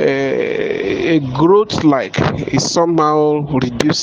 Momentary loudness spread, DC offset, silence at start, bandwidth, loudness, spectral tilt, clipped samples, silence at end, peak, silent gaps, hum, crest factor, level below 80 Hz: 6 LU; under 0.1%; 0 s; 10 kHz; -15 LUFS; -5.5 dB/octave; under 0.1%; 0 s; 0 dBFS; none; none; 14 dB; -44 dBFS